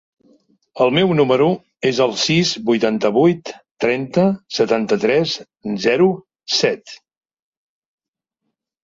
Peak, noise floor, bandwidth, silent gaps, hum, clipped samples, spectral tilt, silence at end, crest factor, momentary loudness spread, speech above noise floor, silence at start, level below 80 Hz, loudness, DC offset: -2 dBFS; -81 dBFS; 7.8 kHz; 3.71-3.75 s; none; under 0.1%; -5 dB/octave; 1.9 s; 16 dB; 8 LU; 64 dB; 0.75 s; -58 dBFS; -17 LUFS; under 0.1%